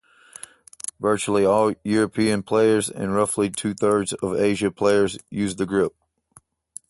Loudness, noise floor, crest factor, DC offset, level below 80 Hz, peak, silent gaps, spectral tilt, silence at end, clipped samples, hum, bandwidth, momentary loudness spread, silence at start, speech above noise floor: -22 LUFS; -56 dBFS; 16 dB; under 0.1%; -54 dBFS; -6 dBFS; none; -5 dB/octave; 1 s; under 0.1%; none; 12 kHz; 15 LU; 0.85 s; 35 dB